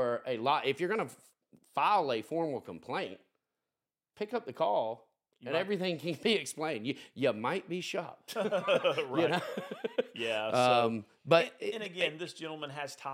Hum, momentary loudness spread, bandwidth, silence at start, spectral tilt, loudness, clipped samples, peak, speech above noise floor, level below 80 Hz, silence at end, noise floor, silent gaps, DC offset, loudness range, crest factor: none; 12 LU; 16.5 kHz; 0 s; -4.5 dB/octave; -33 LUFS; under 0.1%; -10 dBFS; over 57 dB; -86 dBFS; 0 s; under -90 dBFS; none; under 0.1%; 6 LU; 24 dB